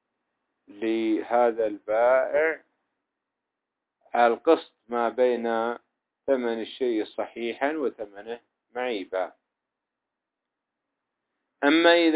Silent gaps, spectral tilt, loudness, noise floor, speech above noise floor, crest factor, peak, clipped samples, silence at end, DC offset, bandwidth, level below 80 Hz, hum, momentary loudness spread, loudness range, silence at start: none; -7.5 dB/octave; -25 LUFS; -86 dBFS; 62 dB; 20 dB; -6 dBFS; under 0.1%; 0 s; under 0.1%; 4 kHz; -74 dBFS; none; 16 LU; 9 LU; 0.7 s